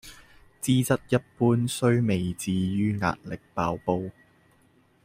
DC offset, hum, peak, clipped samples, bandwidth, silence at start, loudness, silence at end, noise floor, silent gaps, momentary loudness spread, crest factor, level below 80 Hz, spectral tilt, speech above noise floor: under 0.1%; none; -8 dBFS; under 0.1%; 16 kHz; 0.05 s; -26 LUFS; 0.95 s; -62 dBFS; none; 8 LU; 18 dB; -56 dBFS; -6 dB/octave; 37 dB